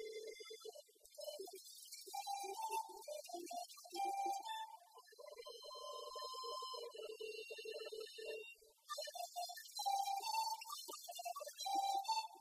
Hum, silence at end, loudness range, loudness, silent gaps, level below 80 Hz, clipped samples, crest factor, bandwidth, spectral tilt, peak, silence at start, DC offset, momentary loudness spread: none; 0 s; 6 LU; -47 LUFS; none; under -90 dBFS; under 0.1%; 18 dB; 15.5 kHz; 1.5 dB/octave; -30 dBFS; 0 s; under 0.1%; 14 LU